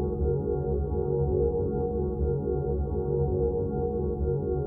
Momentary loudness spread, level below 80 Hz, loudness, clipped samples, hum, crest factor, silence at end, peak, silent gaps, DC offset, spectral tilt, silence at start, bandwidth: 3 LU; -34 dBFS; -28 LUFS; under 0.1%; none; 12 dB; 0 s; -14 dBFS; none; under 0.1%; -14.5 dB/octave; 0 s; 1.5 kHz